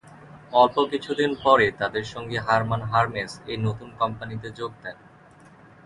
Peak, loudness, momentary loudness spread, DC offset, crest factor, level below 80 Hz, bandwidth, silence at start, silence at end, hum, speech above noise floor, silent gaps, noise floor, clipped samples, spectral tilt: -2 dBFS; -24 LUFS; 15 LU; under 0.1%; 22 dB; -54 dBFS; 11.5 kHz; 0.05 s; 0.9 s; none; 27 dB; none; -51 dBFS; under 0.1%; -6 dB/octave